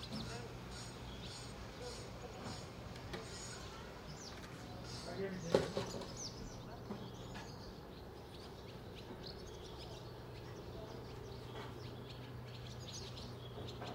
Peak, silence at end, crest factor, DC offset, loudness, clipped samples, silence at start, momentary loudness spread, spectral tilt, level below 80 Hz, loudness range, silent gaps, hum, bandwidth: -16 dBFS; 0 s; 32 dB; under 0.1%; -47 LUFS; under 0.1%; 0 s; 7 LU; -4.5 dB/octave; -60 dBFS; 7 LU; none; none; 16 kHz